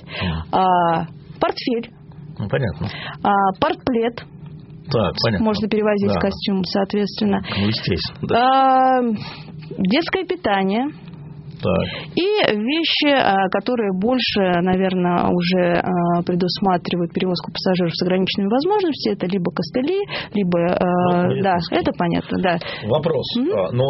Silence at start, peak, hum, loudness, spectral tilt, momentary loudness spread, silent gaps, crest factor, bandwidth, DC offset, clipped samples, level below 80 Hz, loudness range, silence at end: 0 s; -2 dBFS; none; -19 LUFS; -4.5 dB/octave; 8 LU; none; 18 dB; 6 kHz; under 0.1%; under 0.1%; -46 dBFS; 4 LU; 0 s